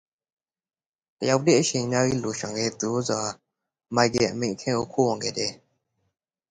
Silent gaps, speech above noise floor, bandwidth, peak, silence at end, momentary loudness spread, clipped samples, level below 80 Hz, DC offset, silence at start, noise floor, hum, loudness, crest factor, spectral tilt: none; 50 dB; 10 kHz; -6 dBFS; 0.95 s; 9 LU; under 0.1%; -60 dBFS; under 0.1%; 1.2 s; -74 dBFS; none; -25 LUFS; 22 dB; -4 dB/octave